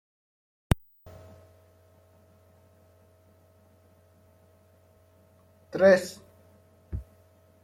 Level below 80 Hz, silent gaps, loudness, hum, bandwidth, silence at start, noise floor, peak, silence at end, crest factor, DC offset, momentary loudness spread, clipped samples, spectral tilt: -48 dBFS; none; -26 LUFS; none; 16.5 kHz; 0.7 s; -60 dBFS; -6 dBFS; 0.6 s; 26 dB; under 0.1%; 30 LU; under 0.1%; -6 dB/octave